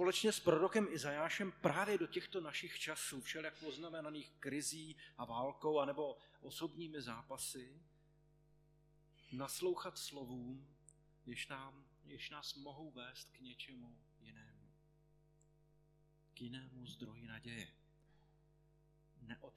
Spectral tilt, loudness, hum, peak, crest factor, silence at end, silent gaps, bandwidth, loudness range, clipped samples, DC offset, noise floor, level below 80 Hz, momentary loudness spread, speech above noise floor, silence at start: -3.5 dB/octave; -43 LUFS; 50 Hz at -70 dBFS; -18 dBFS; 26 dB; 0.05 s; none; 14.5 kHz; 16 LU; under 0.1%; under 0.1%; -73 dBFS; -76 dBFS; 19 LU; 29 dB; 0 s